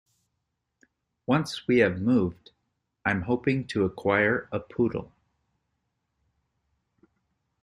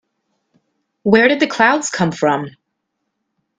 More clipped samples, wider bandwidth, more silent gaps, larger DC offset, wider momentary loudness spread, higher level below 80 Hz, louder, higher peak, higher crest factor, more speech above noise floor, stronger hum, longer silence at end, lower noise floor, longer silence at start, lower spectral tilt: neither; first, 12 kHz vs 9.6 kHz; neither; neither; about the same, 9 LU vs 11 LU; about the same, -60 dBFS vs -58 dBFS; second, -26 LUFS vs -15 LUFS; second, -8 dBFS vs 0 dBFS; about the same, 22 dB vs 18 dB; second, 55 dB vs 59 dB; neither; first, 2.6 s vs 1.1 s; first, -80 dBFS vs -74 dBFS; first, 1.3 s vs 1.05 s; first, -7 dB/octave vs -4.5 dB/octave